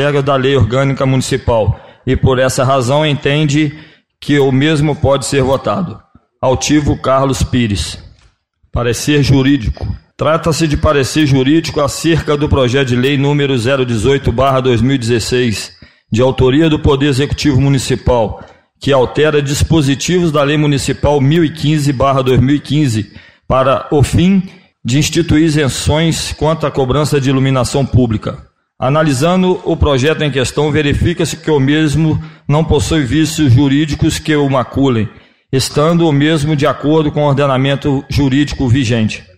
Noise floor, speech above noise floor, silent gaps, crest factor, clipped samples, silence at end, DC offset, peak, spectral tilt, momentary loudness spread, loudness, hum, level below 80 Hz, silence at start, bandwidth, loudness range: -52 dBFS; 41 dB; none; 10 dB; under 0.1%; 0.15 s; 0.8%; -2 dBFS; -6 dB/octave; 6 LU; -12 LUFS; none; -30 dBFS; 0 s; 15 kHz; 2 LU